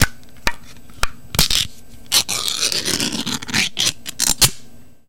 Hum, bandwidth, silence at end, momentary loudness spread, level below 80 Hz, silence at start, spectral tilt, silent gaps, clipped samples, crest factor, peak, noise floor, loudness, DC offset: none; 17.5 kHz; 0 s; 10 LU; -34 dBFS; 0 s; -1 dB/octave; none; under 0.1%; 20 dB; 0 dBFS; -41 dBFS; -18 LUFS; 2%